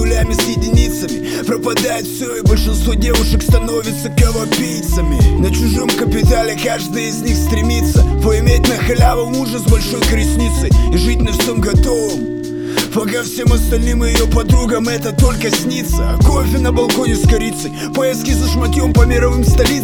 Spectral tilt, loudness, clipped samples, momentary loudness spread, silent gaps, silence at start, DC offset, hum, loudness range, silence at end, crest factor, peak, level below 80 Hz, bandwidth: -5.5 dB/octave; -14 LUFS; under 0.1%; 6 LU; none; 0 s; under 0.1%; none; 2 LU; 0 s; 12 dB; 0 dBFS; -16 dBFS; 18.5 kHz